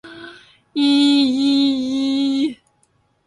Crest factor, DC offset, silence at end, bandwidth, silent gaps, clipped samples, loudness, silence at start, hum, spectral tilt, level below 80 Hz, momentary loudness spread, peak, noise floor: 14 dB; under 0.1%; 0.75 s; 11 kHz; none; under 0.1%; -17 LUFS; 0.05 s; none; -3.5 dB/octave; -62 dBFS; 14 LU; -6 dBFS; -62 dBFS